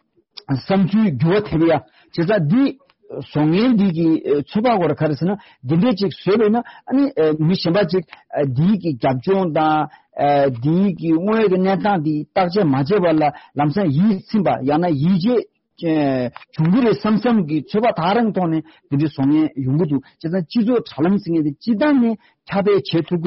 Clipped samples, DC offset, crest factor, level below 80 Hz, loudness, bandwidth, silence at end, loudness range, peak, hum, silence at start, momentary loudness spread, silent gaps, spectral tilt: under 0.1%; under 0.1%; 10 dB; -54 dBFS; -18 LUFS; 6 kHz; 0 s; 1 LU; -6 dBFS; none; 0.5 s; 7 LU; none; -6.5 dB/octave